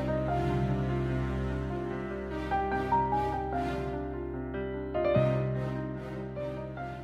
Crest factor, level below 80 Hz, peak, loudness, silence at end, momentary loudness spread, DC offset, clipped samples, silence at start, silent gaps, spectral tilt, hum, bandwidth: 16 dB; -42 dBFS; -14 dBFS; -32 LUFS; 0 s; 9 LU; under 0.1%; under 0.1%; 0 s; none; -8.5 dB/octave; none; 8 kHz